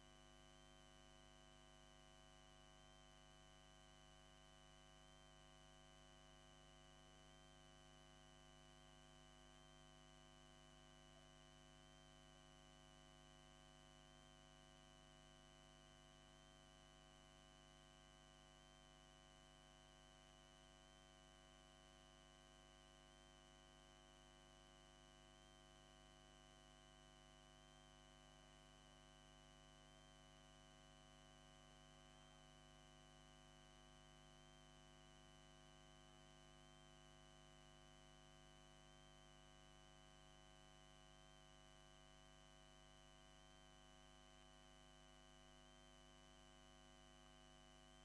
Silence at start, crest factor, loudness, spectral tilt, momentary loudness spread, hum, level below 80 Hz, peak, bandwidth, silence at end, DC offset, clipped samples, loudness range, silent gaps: 0 s; 16 dB; -67 LUFS; -3.5 dB/octave; 0 LU; 50 Hz at -70 dBFS; -74 dBFS; -52 dBFS; 10.5 kHz; 0 s; under 0.1%; under 0.1%; 0 LU; none